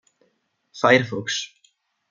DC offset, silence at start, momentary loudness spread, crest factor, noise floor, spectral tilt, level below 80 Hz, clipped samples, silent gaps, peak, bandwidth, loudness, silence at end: under 0.1%; 0.75 s; 12 LU; 22 dB; -69 dBFS; -4 dB/octave; -70 dBFS; under 0.1%; none; -2 dBFS; 7.6 kHz; -20 LUFS; 0.65 s